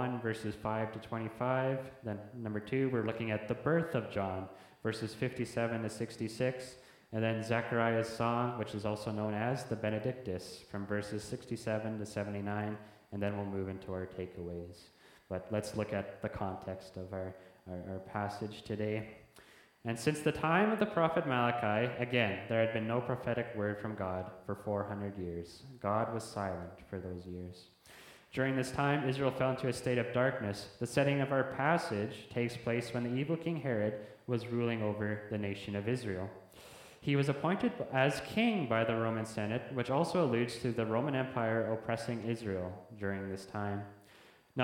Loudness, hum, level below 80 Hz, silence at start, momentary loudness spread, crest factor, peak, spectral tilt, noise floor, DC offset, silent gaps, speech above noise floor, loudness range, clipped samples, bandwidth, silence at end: -36 LUFS; none; -66 dBFS; 0 s; 12 LU; 22 dB; -14 dBFS; -6.5 dB/octave; -61 dBFS; under 0.1%; none; 26 dB; 8 LU; under 0.1%; 16.5 kHz; 0 s